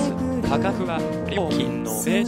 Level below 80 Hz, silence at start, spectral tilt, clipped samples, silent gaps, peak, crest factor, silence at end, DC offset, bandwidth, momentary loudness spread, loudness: -44 dBFS; 0 s; -5.5 dB/octave; under 0.1%; none; -8 dBFS; 16 dB; 0 s; under 0.1%; 16 kHz; 3 LU; -24 LUFS